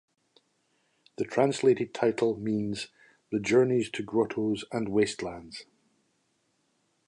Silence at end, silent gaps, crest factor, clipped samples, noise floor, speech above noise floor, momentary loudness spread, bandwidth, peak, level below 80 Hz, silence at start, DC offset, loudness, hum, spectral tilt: 1.45 s; none; 20 dB; under 0.1%; -74 dBFS; 46 dB; 14 LU; 11 kHz; -10 dBFS; -66 dBFS; 1.2 s; under 0.1%; -28 LUFS; none; -5.5 dB/octave